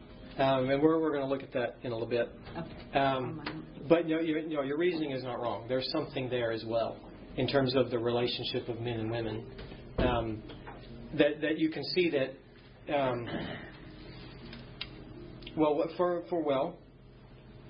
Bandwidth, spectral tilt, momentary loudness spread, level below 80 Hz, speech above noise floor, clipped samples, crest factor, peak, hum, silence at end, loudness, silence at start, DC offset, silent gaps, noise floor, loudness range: 5.4 kHz; -10 dB/octave; 19 LU; -52 dBFS; 23 dB; under 0.1%; 22 dB; -10 dBFS; none; 0 s; -32 LUFS; 0 s; under 0.1%; none; -54 dBFS; 4 LU